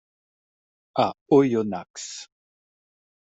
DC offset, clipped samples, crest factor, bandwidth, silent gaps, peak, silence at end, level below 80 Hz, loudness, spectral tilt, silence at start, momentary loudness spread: under 0.1%; under 0.1%; 20 dB; 8 kHz; 1.21-1.26 s, 1.90-1.94 s; -6 dBFS; 1 s; -70 dBFS; -23 LUFS; -5.5 dB/octave; 0.95 s; 17 LU